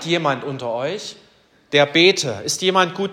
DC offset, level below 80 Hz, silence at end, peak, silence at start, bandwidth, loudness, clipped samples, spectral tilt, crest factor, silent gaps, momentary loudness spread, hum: under 0.1%; -68 dBFS; 0 s; 0 dBFS; 0 s; 16 kHz; -18 LUFS; under 0.1%; -3.5 dB/octave; 18 dB; none; 12 LU; none